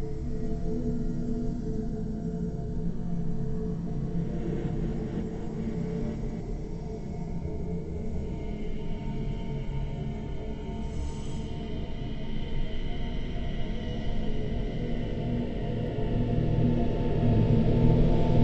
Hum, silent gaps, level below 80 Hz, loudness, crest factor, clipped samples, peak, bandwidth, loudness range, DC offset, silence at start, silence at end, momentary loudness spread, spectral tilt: none; none; -34 dBFS; -32 LUFS; 20 dB; under 0.1%; -8 dBFS; 8.2 kHz; 8 LU; under 0.1%; 0 s; 0 s; 11 LU; -9 dB/octave